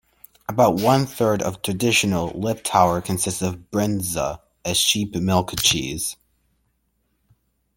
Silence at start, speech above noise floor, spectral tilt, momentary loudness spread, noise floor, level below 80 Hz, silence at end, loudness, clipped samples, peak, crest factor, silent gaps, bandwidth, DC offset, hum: 0.5 s; 49 dB; -3.5 dB/octave; 9 LU; -69 dBFS; -50 dBFS; 1.65 s; -21 LUFS; under 0.1%; -2 dBFS; 20 dB; none; 17 kHz; under 0.1%; none